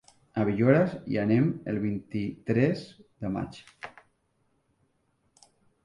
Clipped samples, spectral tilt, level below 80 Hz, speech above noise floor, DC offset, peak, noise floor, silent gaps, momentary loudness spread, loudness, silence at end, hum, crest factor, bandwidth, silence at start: under 0.1%; -9 dB/octave; -60 dBFS; 45 dB; under 0.1%; -8 dBFS; -72 dBFS; none; 21 LU; -28 LUFS; 1.95 s; none; 22 dB; 11 kHz; 0.35 s